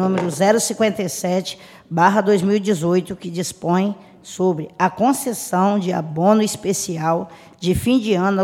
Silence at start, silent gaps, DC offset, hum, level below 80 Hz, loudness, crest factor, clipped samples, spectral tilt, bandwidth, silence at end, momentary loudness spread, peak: 0 s; none; under 0.1%; none; -48 dBFS; -19 LUFS; 18 dB; under 0.1%; -5 dB/octave; 16.5 kHz; 0 s; 10 LU; 0 dBFS